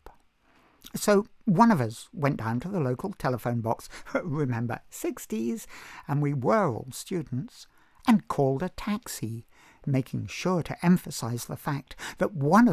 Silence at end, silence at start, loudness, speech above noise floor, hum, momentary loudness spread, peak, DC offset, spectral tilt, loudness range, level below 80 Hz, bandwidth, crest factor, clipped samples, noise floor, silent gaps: 0 s; 0.05 s; -28 LUFS; 35 dB; none; 12 LU; -8 dBFS; under 0.1%; -6.5 dB/octave; 4 LU; -56 dBFS; 15 kHz; 20 dB; under 0.1%; -62 dBFS; none